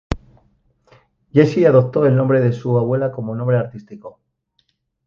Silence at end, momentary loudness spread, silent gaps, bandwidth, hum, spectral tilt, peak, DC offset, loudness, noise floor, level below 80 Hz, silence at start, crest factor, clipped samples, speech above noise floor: 1 s; 16 LU; none; 7 kHz; none; -9 dB/octave; 0 dBFS; under 0.1%; -16 LUFS; -67 dBFS; -42 dBFS; 0.1 s; 18 dB; under 0.1%; 51 dB